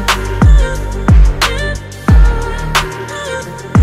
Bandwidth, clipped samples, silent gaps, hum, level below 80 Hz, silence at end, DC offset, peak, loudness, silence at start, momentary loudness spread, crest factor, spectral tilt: 15 kHz; under 0.1%; none; none; -12 dBFS; 0 s; under 0.1%; 0 dBFS; -13 LUFS; 0 s; 11 LU; 10 dB; -5 dB/octave